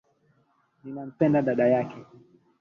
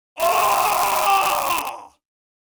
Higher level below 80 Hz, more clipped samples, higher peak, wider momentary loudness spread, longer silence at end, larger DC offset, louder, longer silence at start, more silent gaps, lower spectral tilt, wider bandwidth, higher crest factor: second, -68 dBFS vs -56 dBFS; neither; second, -10 dBFS vs -2 dBFS; first, 22 LU vs 9 LU; about the same, 0.55 s vs 0.55 s; neither; second, -24 LUFS vs -19 LUFS; first, 0.85 s vs 0.15 s; neither; first, -9.5 dB/octave vs -0.5 dB/octave; second, 6.8 kHz vs over 20 kHz; about the same, 18 dB vs 18 dB